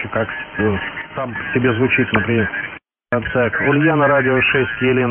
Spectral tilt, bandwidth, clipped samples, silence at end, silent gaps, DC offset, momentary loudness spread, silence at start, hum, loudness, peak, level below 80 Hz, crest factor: -4.5 dB/octave; 3.5 kHz; under 0.1%; 0 s; none; under 0.1%; 11 LU; 0 s; none; -17 LUFS; -4 dBFS; -44 dBFS; 14 dB